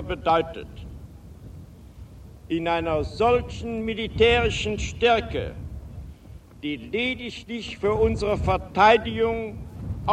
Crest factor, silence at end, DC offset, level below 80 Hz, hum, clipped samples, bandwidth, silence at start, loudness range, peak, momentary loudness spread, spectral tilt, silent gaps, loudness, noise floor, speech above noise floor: 20 dB; 0 s; under 0.1%; -38 dBFS; none; under 0.1%; 9.8 kHz; 0 s; 5 LU; -4 dBFS; 23 LU; -5.5 dB/octave; none; -24 LUFS; -45 dBFS; 22 dB